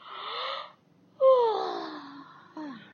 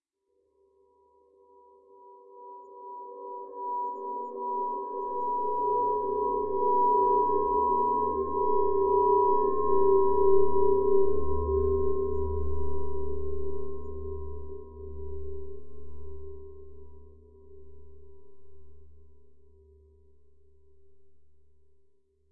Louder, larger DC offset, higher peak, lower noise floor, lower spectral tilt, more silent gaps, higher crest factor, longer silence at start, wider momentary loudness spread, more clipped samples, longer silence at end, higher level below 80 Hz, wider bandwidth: about the same, -27 LUFS vs -27 LUFS; neither; about the same, -12 dBFS vs -10 dBFS; second, -60 dBFS vs -74 dBFS; second, -4.5 dB/octave vs -14 dB/octave; neither; about the same, 18 dB vs 16 dB; about the same, 0.05 s vs 0 s; first, 25 LU vs 22 LU; neither; about the same, 0.1 s vs 0 s; second, under -90 dBFS vs -46 dBFS; first, 6.6 kHz vs 1.8 kHz